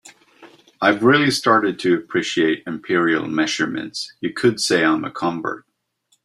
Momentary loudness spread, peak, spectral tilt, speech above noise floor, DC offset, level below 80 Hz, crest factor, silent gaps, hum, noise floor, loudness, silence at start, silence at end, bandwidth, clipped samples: 11 LU; -2 dBFS; -4 dB/octave; 47 dB; under 0.1%; -62 dBFS; 18 dB; none; none; -66 dBFS; -19 LUFS; 0.05 s; 0.65 s; 13.5 kHz; under 0.1%